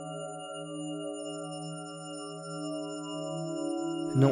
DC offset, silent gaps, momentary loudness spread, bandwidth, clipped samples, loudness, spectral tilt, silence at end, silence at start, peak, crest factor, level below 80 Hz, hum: under 0.1%; none; 7 LU; 10 kHz; under 0.1%; -36 LUFS; -6 dB/octave; 0 s; 0 s; -12 dBFS; 22 dB; -74 dBFS; none